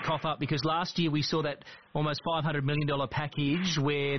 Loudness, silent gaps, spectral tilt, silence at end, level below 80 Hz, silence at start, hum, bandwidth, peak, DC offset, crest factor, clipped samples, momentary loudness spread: -30 LUFS; none; -4.5 dB/octave; 0 s; -58 dBFS; 0 s; none; 6.4 kHz; -18 dBFS; 0.2%; 12 dB; under 0.1%; 4 LU